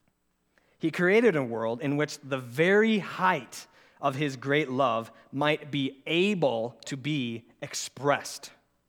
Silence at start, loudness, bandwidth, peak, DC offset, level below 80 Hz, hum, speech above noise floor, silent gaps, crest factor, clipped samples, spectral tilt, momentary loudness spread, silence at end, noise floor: 0.85 s; -28 LUFS; 17.5 kHz; -8 dBFS; under 0.1%; -78 dBFS; none; 45 dB; none; 20 dB; under 0.1%; -5 dB/octave; 13 LU; 0.4 s; -73 dBFS